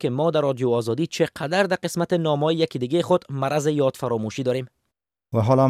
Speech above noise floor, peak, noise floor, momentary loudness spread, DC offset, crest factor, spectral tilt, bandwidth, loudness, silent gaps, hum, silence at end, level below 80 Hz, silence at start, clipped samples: 58 dB; -6 dBFS; -80 dBFS; 5 LU; under 0.1%; 16 dB; -6 dB/octave; 15 kHz; -23 LUFS; none; none; 0 s; -62 dBFS; 0 s; under 0.1%